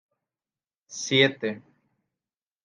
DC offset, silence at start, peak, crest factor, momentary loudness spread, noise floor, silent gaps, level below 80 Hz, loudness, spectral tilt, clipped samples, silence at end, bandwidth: under 0.1%; 0.9 s; -6 dBFS; 24 dB; 20 LU; under -90 dBFS; none; -78 dBFS; -24 LUFS; -3.5 dB/octave; under 0.1%; 1.05 s; 10 kHz